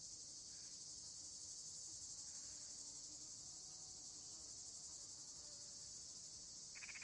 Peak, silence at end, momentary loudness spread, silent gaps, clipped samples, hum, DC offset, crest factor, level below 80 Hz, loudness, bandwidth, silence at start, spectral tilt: -40 dBFS; 0 s; 2 LU; none; under 0.1%; none; under 0.1%; 14 dB; -80 dBFS; -52 LUFS; 12 kHz; 0 s; 0.5 dB/octave